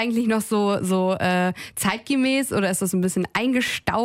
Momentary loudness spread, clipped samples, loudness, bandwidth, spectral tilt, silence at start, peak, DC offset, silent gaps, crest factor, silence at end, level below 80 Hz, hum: 3 LU; under 0.1%; -22 LUFS; 16 kHz; -4.5 dB/octave; 0 s; -6 dBFS; under 0.1%; none; 16 dB; 0 s; -54 dBFS; none